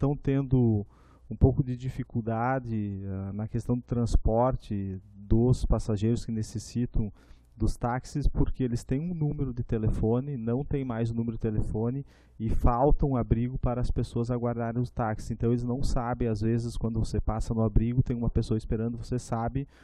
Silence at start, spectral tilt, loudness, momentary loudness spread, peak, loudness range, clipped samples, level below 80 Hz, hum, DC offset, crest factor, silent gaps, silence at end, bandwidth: 0 s; -8.5 dB/octave; -29 LUFS; 9 LU; -8 dBFS; 2 LU; under 0.1%; -34 dBFS; none; under 0.1%; 20 dB; none; 0.2 s; 11 kHz